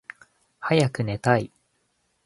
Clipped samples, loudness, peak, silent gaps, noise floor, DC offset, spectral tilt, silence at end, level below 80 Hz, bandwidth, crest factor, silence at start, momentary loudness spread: under 0.1%; -24 LUFS; -2 dBFS; none; -71 dBFS; under 0.1%; -6.5 dB/octave; 0.8 s; -58 dBFS; 11.5 kHz; 24 dB; 0.6 s; 16 LU